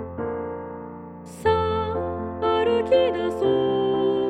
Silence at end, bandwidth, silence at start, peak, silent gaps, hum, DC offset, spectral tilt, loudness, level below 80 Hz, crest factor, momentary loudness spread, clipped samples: 0 s; 11.5 kHz; 0 s; -8 dBFS; none; none; under 0.1%; -7 dB/octave; -23 LUFS; -48 dBFS; 14 dB; 16 LU; under 0.1%